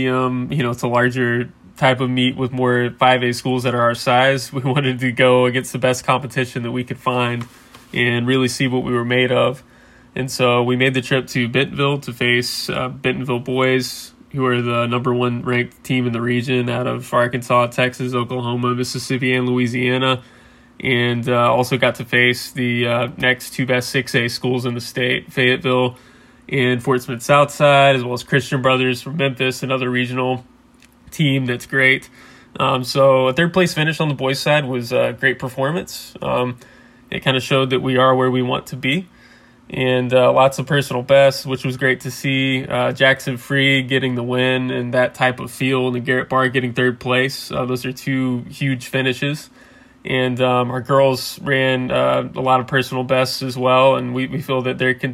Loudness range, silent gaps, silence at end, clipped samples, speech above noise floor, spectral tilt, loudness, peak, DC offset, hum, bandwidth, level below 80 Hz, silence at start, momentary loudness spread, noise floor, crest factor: 3 LU; none; 0 s; under 0.1%; 32 dB; -5.5 dB/octave; -18 LUFS; 0 dBFS; under 0.1%; none; 16 kHz; -54 dBFS; 0 s; 8 LU; -50 dBFS; 18 dB